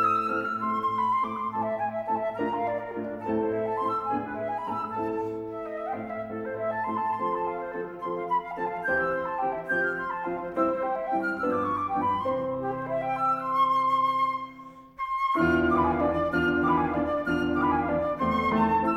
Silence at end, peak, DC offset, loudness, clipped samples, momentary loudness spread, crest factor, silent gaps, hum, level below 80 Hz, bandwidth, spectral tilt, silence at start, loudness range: 0 s; -12 dBFS; under 0.1%; -28 LUFS; under 0.1%; 10 LU; 16 dB; none; none; -52 dBFS; 15.5 kHz; -7.5 dB/octave; 0 s; 6 LU